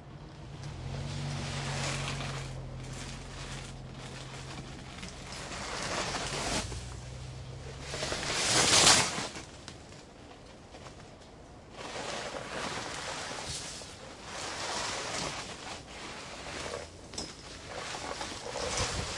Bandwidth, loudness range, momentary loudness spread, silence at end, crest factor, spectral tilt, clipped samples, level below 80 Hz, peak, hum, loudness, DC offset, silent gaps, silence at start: 11.5 kHz; 14 LU; 16 LU; 0 s; 30 dB; -2 dB/octave; under 0.1%; -52 dBFS; -6 dBFS; none; -33 LUFS; under 0.1%; none; 0 s